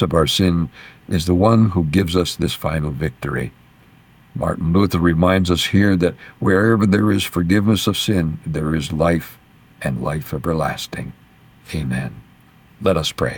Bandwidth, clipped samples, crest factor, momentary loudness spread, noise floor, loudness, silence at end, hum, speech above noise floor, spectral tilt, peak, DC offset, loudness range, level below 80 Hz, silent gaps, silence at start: 19 kHz; under 0.1%; 16 dB; 11 LU; -49 dBFS; -18 LUFS; 0 s; none; 31 dB; -6 dB/octave; -4 dBFS; under 0.1%; 8 LU; -38 dBFS; none; 0 s